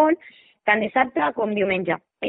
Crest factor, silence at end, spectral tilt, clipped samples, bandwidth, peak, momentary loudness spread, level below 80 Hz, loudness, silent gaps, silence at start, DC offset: 18 dB; 0 s; -10 dB/octave; under 0.1%; 4.1 kHz; -4 dBFS; 8 LU; -64 dBFS; -22 LUFS; none; 0 s; under 0.1%